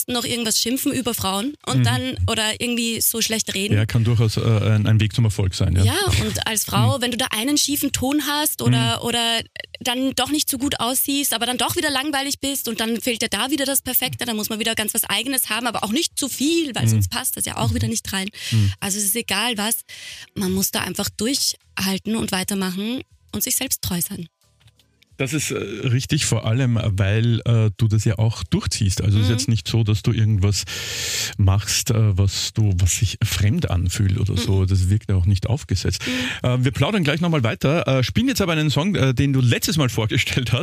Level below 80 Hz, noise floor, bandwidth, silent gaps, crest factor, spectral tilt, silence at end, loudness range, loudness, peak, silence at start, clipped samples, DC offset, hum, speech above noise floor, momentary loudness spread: -42 dBFS; -56 dBFS; 15.5 kHz; none; 16 dB; -4 dB/octave; 0 s; 3 LU; -20 LUFS; -4 dBFS; 0 s; under 0.1%; under 0.1%; none; 36 dB; 5 LU